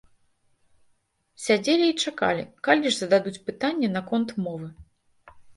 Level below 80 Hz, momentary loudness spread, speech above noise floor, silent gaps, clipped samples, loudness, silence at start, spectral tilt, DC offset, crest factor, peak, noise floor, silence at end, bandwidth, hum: -62 dBFS; 12 LU; 44 dB; none; under 0.1%; -24 LUFS; 1.4 s; -4 dB/octave; under 0.1%; 24 dB; -4 dBFS; -68 dBFS; 0.05 s; 11.5 kHz; none